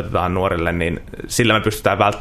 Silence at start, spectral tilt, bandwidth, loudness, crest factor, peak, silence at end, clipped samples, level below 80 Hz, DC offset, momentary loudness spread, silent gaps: 0 s; -4.5 dB/octave; 14 kHz; -18 LUFS; 18 dB; -2 dBFS; 0 s; under 0.1%; -38 dBFS; under 0.1%; 7 LU; none